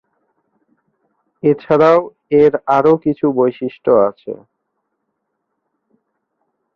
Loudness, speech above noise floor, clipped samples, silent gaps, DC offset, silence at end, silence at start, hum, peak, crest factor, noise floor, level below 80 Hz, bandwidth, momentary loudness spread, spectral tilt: -14 LUFS; 59 dB; under 0.1%; none; under 0.1%; 2.4 s; 1.45 s; none; 0 dBFS; 16 dB; -73 dBFS; -56 dBFS; 6.4 kHz; 9 LU; -8.5 dB/octave